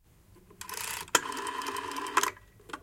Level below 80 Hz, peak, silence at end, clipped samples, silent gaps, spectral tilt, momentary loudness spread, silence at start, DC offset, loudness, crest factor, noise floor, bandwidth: -64 dBFS; -6 dBFS; 0 s; under 0.1%; none; -0.5 dB/octave; 17 LU; 0.3 s; under 0.1%; -32 LUFS; 28 dB; -59 dBFS; 17 kHz